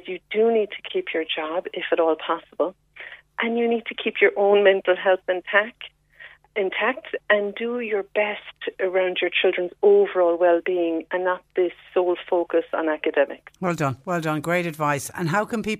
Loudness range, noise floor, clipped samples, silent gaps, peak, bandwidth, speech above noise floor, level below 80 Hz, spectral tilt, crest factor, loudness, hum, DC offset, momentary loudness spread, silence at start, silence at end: 4 LU; -48 dBFS; under 0.1%; none; -4 dBFS; 15 kHz; 25 dB; -64 dBFS; -5 dB/octave; 18 dB; -23 LUFS; none; under 0.1%; 10 LU; 0.05 s; 0 s